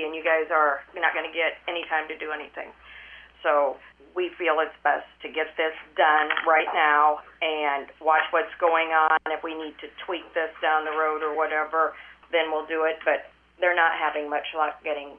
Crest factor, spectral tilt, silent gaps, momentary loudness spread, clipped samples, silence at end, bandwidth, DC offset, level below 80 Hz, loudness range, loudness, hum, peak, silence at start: 20 dB; -5 dB/octave; none; 13 LU; under 0.1%; 0 s; 4 kHz; under 0.1%; -66 dBFS; 5 LU; -24 LUFS; none; -4 dBFS; 0 s